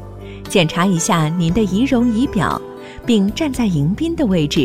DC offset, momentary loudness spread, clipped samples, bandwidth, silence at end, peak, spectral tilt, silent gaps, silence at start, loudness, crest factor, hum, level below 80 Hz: 0.4%; 9 LU; under 0.1%; 16 kHz; 0 s; -2 dBFS; -5.5 dB/octave; none; 0 s; -17 LUFS; 14 dB; none; -36 dBFS